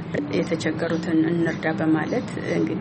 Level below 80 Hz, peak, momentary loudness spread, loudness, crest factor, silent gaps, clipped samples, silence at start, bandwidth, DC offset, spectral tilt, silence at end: -56 dBFS; -10 dBFS; 4 LU; -24 LUFS; 14 dB; none; under 0.1%; 0 s; 8.6 kHz; under 0.1%; -7 dB/octave; 0 s